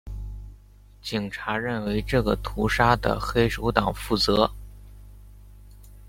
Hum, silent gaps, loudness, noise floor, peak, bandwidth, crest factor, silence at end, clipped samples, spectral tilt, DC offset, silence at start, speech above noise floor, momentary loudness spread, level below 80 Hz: 50 Hz at -35 dBFS; none; -24 LUFS; -50 dBFS; -2 dBFS; 16.5 kHz; 24 dB; 0 s; under 0.1%; -5.5 dB/octave; under 0.1%; 0.05 s; 26 dB; 18 LU; -38 dBFS